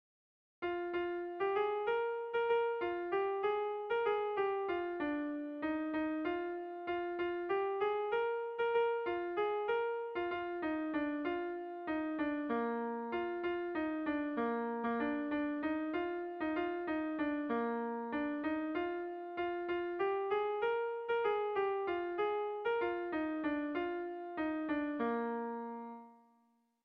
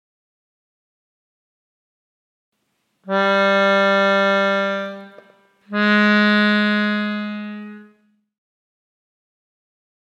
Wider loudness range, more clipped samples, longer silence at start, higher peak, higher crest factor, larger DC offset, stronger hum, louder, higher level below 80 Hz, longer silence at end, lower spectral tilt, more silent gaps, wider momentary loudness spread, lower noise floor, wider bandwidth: second, 2 LU vs 9 LU; neither; second, 0.6 s vs 3.05 s; second, -24 dBFS vs -4 dBFS; about the same, 14 dB vs 18 dB; neither; neither; second, -37 LUFS vs -17 LUFS; first, -72 dBFS vs -78 dBFS; second, 0.7 s vs 2.2 s; second, -3 dB/octave vs -6 dB/octave; neither; second, 5 LU vs 17 LU; first, -74 dBFS vs -70 dBFS; second, 5.6 kHz vs 7.8 kHz